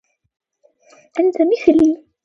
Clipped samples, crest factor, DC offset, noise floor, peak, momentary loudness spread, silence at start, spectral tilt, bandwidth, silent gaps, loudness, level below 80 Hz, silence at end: under 0.1%; 18 dB; under 0.1%; -56 dBFS; 0 dBFS; 6 LU; 1.15 s; -6 dB/octave; 7.6 kHz; none; -16 LUFS; -54 dBFS; 0.3 s